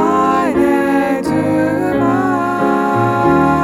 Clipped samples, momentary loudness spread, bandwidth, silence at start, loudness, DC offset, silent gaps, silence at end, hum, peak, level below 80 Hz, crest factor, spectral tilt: under 0.1%; 3 LU; 15.5 kHz; 0 s; -14 LUFS; under 0.1%; none; 0 s; none; -2 dBFS; -42 dBFS; 12 dB; -7 dB/octave